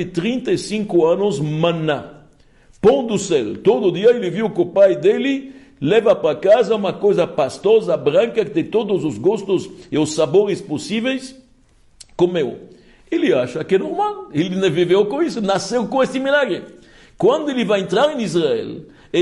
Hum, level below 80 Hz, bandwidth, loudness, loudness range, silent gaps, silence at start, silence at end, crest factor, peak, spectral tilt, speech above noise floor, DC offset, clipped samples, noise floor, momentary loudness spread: none; -54 dBFS; 11.5 kHz; -18 LUFS; 5 LU; none; 0 s; 0 s; 14 dB; -4 dBFS; -5.5 dB/octave; 35 dB; under 0.1%; under 0.1%; -52 dBFS; 8 LU